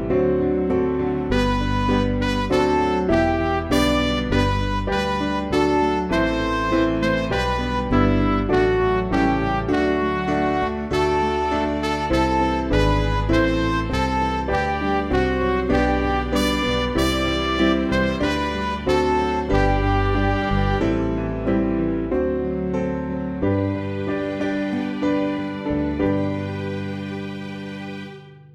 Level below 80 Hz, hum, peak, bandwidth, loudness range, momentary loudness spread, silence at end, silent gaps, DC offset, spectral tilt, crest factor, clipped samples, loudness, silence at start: -30 dBFS; none; -4 dBFS; 15.5 kHz; 4 LU; 6 LU; 0.1 s; none; under 0.1%; -6.5 dB/octave; 16 dB; under 0.1%; -21 LUFS; 0 s